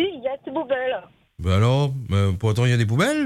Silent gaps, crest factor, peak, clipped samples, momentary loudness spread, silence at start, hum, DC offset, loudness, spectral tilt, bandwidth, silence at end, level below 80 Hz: none; 12 dB; -8 dBFS; under 0.1%; 10 LU; 0 s; none; under 0.1%; -22 LUFS; -6.5 dB/octave; 13 kHz; 0 s; -50 dBFS